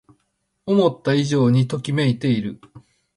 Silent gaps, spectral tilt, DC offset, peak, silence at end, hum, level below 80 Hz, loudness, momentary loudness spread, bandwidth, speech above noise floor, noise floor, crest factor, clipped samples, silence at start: none; -7 dB/octave; under 0.1%; -4 dBFS; 0.35 s; none; -58 dBFS; -20 LUFS; 7 LU; 11.5 kHz; 53 dB; -71 dBFS; 16 dB; under 0.1%; 0.65 s